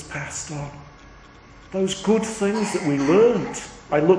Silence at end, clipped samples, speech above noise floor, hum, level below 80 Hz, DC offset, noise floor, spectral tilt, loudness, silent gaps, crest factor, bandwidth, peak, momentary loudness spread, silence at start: 0 s; under 0.1%; 25 dB; none; -50 dBFS; under 0.1%; -46 dBFS; -5.5 dB/octave; -22 LUFS; none; 18 dB; 10.5 kHz; -4 dBFS; 16 LU; 0 s